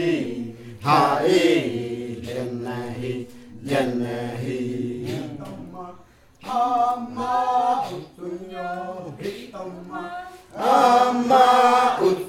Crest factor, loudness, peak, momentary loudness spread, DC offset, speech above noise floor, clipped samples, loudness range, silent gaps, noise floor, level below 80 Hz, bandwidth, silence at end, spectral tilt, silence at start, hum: 18 dB; -22 LUFS; -4 dBFS; 19 LU; under 0.1%; 31 dB; under 0.1%; 8 LU; none; -49 dBFS; -60 dBFS; 16.5 kHz; 0 s; -5.5 dB/octave; 0 s; none